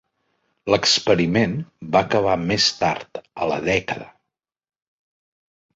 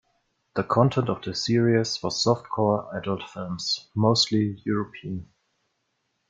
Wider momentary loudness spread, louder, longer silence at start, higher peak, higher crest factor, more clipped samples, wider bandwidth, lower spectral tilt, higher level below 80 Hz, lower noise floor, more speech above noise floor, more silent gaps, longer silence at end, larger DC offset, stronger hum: about the same, 14 LU vs 12 LU; first, -20 LUFS vs -25 LUFS; about the same, 0.65 s vs 0.55 s; about the same, -2 dBFS vs -4 dBFS; about the same, 20 dB vs 22 dB; neither; second, 8 kHz vs 9.2 kHz; second, -4 dB/octave vs -5.5 dB/octave; first, -50 dBFS vs -60 dBFS; first, -82 dBFS vs -75 dBFS; first, 62 dB vs 51 dB; neither; first, 1.7 s vs 1.05 s; neither; neither